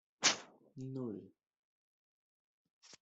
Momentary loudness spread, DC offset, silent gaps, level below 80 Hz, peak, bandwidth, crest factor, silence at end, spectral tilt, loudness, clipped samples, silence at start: 19 LU; under 0.1%; 1.59-2.81 s; -84 dBFS; -14 dBFS; 8.2 kHz; 30 dB; 0.05 s; -1.5 dB/octave; -37 LUFS; under 0.1%; 0.2 s